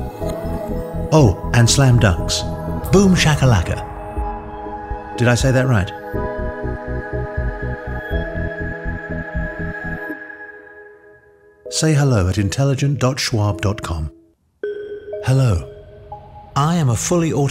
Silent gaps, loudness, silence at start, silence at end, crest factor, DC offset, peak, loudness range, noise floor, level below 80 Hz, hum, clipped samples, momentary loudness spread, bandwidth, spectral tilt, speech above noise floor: none; -19 LUFS; 0 s; 0 s; 18 dB; under 0.1%; 0 dBFS; 10 LU; -49 dBFS; -30 dBFS; none; under 0.1%; 16 LU; 15.5 kHz; -5.5 dB/octave; 34 dB